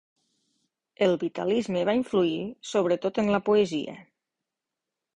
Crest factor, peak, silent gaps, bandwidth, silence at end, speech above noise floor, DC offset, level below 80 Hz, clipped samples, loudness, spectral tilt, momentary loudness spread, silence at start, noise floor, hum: 18 dB; -10 dBFS; none; 10.5 kHz; 1.15 s; 62 dB; under 0.1%; -64 dBFS; under 0.1%; -26 LUFS; -6 dB/octave; 6 LU; 1 s; -87 dBFS; none